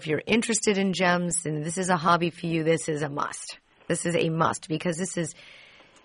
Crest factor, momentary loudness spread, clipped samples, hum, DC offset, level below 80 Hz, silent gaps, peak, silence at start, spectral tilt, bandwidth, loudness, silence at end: 20 dB; 9 LU; under 0.1%; none; under 0.1%; -62 dBFS; none; -6 dBFS; 0 s; -4.5 dB/octave; 11 kHz; -26 LUFS; 0.45 s